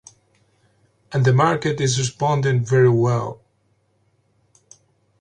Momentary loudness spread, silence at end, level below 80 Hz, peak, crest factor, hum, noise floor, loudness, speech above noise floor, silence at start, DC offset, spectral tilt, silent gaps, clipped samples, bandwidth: 7 LU; 1.85 s; -56 dBFS; -4 dBFS; 18 dB; none; -65 dBFS; -19 LUFS; 47 dB; 1.1 s; under 0.1%; -6 dB/octave; none; under 0.1%; 9.6 kHz